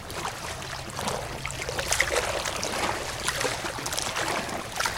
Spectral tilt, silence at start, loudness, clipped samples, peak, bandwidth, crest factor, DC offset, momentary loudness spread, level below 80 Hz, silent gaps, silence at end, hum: -2 dB/octave; 0 s; -29 LUFS; under 0.1%; -6 dBFS; 17 kHz; 24 dB; under 0.1%; 9 LU; -46 dBFS; none; 0 s; none